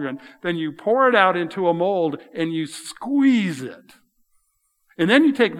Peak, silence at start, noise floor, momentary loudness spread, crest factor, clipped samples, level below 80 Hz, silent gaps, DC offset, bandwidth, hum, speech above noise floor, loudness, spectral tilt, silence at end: 0 dBFS; 0 s; -69 dBFS; 15 LU; 20 dB; under 0.1%; -76 dBFS; none; under 0.1%; 13.5 kHz; none; 49 dB; -20 LUFS; -5.5 dB/octave; 0 s